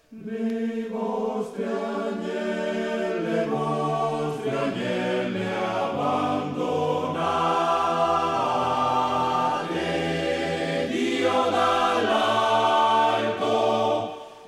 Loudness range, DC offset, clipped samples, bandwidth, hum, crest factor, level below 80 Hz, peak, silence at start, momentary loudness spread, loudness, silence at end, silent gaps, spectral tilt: 5 LU; under 0.1%; under 0.1%; 15 kHz; none; 14 dB; -64 dBFS; -10 dBFS; 0.1 s; 7 LU; -24 LUFS; 0 s; none; -5 dB/octave